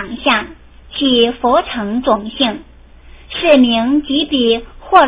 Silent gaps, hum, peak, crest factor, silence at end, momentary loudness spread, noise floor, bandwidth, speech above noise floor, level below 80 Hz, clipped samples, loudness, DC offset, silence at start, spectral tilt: none; none; 0 dBFS; 14 dB; 0 s; 9 LU; -39 dBFS; 4 kHz; 25 dB; -40 dBFS; 0.2%; -14 LUFS; under 0.1%; 0 s; -8.5 dB/octave